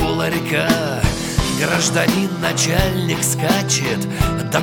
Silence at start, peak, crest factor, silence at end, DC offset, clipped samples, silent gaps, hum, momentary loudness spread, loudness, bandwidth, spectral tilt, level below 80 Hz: 0 s; 0 dBFS; 16 dB; 0 s; under 0.1%; under 0.1%; none; none; 4 LU; -18 LUFS; 17.5 kHz; -4 dB/octave; -30 dBFS